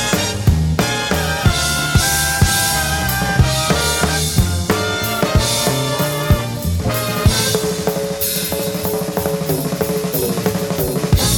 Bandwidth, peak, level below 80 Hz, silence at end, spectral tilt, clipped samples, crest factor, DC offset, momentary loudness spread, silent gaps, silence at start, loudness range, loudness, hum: over 20 kHz; 0 dBFS; -26 dBFS; 0 s; -4 dB/octave; under 0.1%; 16 dB; under 0.1%; 5 LU; none; 0 s; 3 LU; -17 LUFS; none